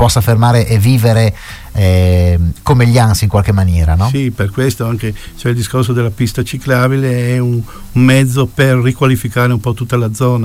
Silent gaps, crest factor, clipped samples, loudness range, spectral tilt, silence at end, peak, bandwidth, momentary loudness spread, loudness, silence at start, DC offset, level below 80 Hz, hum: none; 12 dB; under 0.1%; 4 LU; -6.5 dB/octave; 0 s; 0 dBFS; 16 kHz; 7 LU; -12 LUFS; 0 s; under 0.1%; -26 dBFS; none